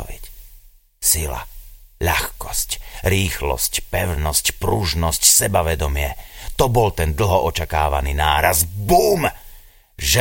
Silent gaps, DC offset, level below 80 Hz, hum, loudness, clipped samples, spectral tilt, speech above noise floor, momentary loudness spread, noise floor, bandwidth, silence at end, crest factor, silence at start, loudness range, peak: none; under 0.1%; -28 dBFS; none; -18 LUFS; under 0.1%; -3 dB/octave; 28 dB; 10 LU; -47 dBFS; 17 kHz; 0 s; 20 dB; 0 s; 4 LU; 0 dBFS